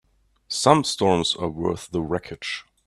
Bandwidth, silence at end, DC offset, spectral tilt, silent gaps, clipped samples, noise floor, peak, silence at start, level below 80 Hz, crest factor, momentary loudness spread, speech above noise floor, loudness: 13.5 kHz; 0.25 s; under 0.1%; -4.5 dB/octave; none; under 0.1%; -42 dBFS; 0 dBFS; 0.5 s; -52 dBFS; 24 dB; 12 LU; 19 dB; -23 LUFS